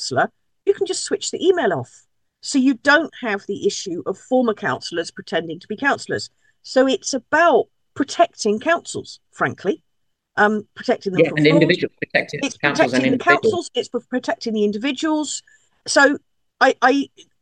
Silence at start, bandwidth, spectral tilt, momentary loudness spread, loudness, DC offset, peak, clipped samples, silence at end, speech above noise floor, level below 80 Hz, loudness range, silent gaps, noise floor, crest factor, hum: 0 s; 10 kHz; -4 dB/octave; 12 LU; -19 LUFS; under 0.1%; -2 dBFS; under 0.1%; 0.35 s; 51 dB; -68 dBFS; 4 LU; none; -70 dBFS; 18 dB; none